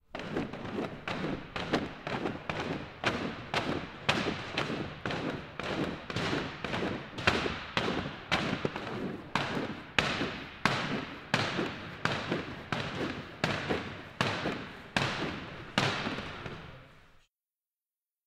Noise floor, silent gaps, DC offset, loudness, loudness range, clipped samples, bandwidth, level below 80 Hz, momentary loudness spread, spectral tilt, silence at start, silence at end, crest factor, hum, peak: under -90 dBFS; none; under 0.1%; -34 LUFS; 2 LU; under 0.1%; 16 kHz; -56 dBFS; 7 LU; -4.5 dB/octave; 0.15 s; 1.15 s; 28 dB; none; -8 dBFS